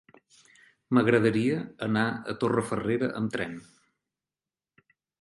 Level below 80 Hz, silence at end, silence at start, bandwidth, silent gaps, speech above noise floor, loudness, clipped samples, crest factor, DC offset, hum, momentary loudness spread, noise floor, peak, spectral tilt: -64 dBFS; 1.6 s; 0.9 s; 11.5 kHz; none; over 63 dB; -27 LUFS; under 0.1%; 20 dB; under 0.1%; none; 9 LU; under -90 dBFS; -8 dBFS; -7 dB/octave